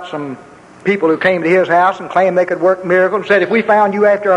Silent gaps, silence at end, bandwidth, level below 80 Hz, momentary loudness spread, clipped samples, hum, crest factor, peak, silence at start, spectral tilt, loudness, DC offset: none; 0 s; 10.5 kHz; -58 dBFS; 11 LU; under 0.1%; none; 12 dB; 0 dBFS; 0 s; -6.5 dB/octave; -13 LUFS; under 0.1%